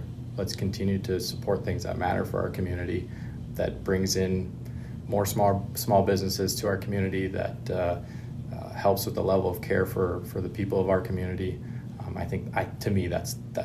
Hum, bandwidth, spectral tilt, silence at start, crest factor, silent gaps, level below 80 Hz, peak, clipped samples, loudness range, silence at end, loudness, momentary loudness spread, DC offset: none; 15 kHz; -5.5 dB/octave; 0 s; 18 dB; none; -48 dBFS; -10 dBFS; under 0.1%; 3 LU; 0 s; -29 LUFS; 12 LU; under 0.1%